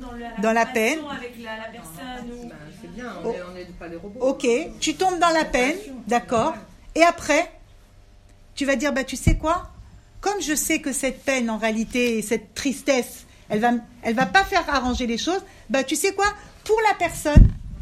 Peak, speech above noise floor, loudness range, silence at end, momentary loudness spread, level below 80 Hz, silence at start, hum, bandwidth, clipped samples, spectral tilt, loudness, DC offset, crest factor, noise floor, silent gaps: 0 dBFS; 28 dB; 6 LU; 0 s; 18 LU; -30 dBFS; 0 s; none; 15.5 kHz; under 0.1%; -4.5 dB/octave; -22 LUFS; under 0.1%; 22 dB; -50 dBFS; none